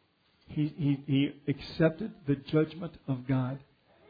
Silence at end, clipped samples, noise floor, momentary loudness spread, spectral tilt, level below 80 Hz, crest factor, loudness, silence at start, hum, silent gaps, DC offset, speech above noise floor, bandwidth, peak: 0.45 s; under 0.1%; -65 dBFS; 9 LU; -9.5 dB/octave; -60 dBFS; 18 dB; -31 LUFS; 0.5 s; none; none; under 0.1%; 34 dB; 5 kHz; -12 dBFS